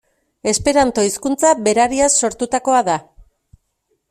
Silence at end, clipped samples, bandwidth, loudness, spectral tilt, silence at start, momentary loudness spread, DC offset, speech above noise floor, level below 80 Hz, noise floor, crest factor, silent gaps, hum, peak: 1.1 s; under 0.1%; 15 kHz; -16 LUFS; -3 dB/octave; 0.45 s; 6 LU; under 0.1%; 53 dB; -46 dBFS; -68 dBFS; 16 dB; none; none; -2 dBFS